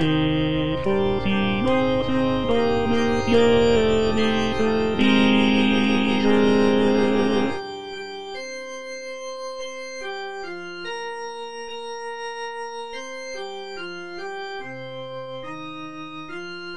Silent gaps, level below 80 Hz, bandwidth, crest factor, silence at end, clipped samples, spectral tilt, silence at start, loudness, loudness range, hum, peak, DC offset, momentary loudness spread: none; -44 dBFS; 10 kHz; 18 dB; 0 s; under 0.1%; -6 dB/octave; 0 s; -22 LUFS; 14 LU; none; -6 dBFS; 0.7%; 16 LU